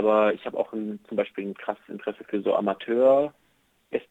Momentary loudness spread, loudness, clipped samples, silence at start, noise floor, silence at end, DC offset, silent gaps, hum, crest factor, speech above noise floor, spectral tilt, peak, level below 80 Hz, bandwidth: 13 LU; -26 LUFS; under 0.1%; 0 s; -61 dBFS; 0.1 s; under 0.1%; none; none; 18 dB; 36 dB; -7.5 dB/octave; -8 dBFS; -76 dBFS; 4 kHz